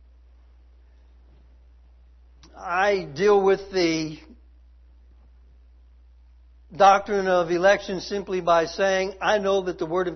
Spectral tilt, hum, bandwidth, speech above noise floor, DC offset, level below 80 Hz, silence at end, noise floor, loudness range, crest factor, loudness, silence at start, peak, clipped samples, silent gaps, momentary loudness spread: -4.5 dB/octave; none; 6.4 kHz; 30 dB; under 0.1%; -52 dBFS; 0 s; -52 dBFS; 7 LU; 20 dB; -22 LUFS; 2.55 s; -4 dBFS; under 0.1%; none; 10 LU